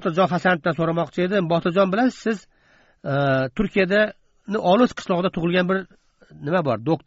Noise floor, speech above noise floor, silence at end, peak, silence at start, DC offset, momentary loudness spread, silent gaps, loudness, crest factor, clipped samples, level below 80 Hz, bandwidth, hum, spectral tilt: -58 dBFS; 37 dB; 0.1 s; -4 dBFS; 0 s; under 0.1%; 8 LU; none; -21 LUFS; 18 dB; under 0.1%; -50 dBFS; 8 kHz; none; -5 dB/octave